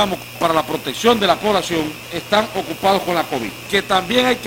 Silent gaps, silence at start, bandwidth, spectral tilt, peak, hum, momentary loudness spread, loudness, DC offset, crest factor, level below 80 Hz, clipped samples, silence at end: none; 0 s; 17 kHz; -3.5 dB/octave; 0 dBFS; none; 8 LU; -18 LUFS; under 0.1%; 18 dB; -48 dBFS; under 0.1%; 0 s